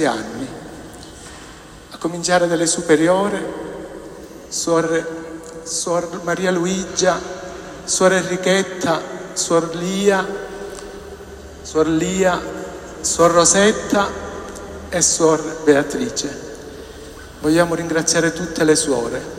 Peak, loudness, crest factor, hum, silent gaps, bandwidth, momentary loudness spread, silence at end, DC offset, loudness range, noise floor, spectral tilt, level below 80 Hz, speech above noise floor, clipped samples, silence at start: 0 dBFS; -18 LUFS; 20 dB; none; none; 16 kHz; 20 LU; 0 s; under 0.1%; 5 LU; -39 dBFS; -3.5 dB/octave; -46 dBFS; 21 dB; under 0.1%; 0 s